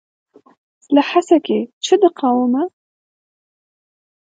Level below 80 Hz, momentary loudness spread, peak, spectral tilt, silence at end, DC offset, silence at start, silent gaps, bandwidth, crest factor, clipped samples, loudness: -74 dBFS; 7 LU; 0 dBFS; -4.5 dB/octave; 1.65 s; under 0.1%; 0.9 s; 1.73-1.81 s; 9.2 kHz; 18 dB; under 0.1%; -16 LUFS